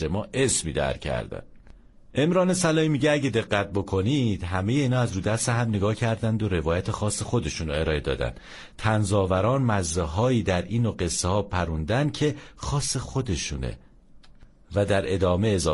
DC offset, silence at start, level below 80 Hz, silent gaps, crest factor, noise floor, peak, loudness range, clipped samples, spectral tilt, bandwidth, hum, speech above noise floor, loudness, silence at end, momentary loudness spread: under 0.1%; 0 s; -42 dBFS; none; 16 dB; -50 dBFS; -8 dBFS; 3 LU; under 0.1%; -5 dB/octave; 11.5 kHz; none; 25 dB; -25 LUFS; 0 s; 8 LU